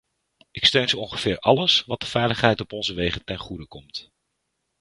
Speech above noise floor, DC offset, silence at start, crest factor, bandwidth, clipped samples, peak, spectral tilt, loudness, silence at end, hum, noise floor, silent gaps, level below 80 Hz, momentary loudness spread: 53 dB; under 0.1%; 0.55 s; 22 dB; 11.5 kHz; under 0.1%; -2 dBFS; -4.5 dB/octave; -21 LUFS; 0.8 s; none; -77 dBFS; none; -48 dBFS; 19 LU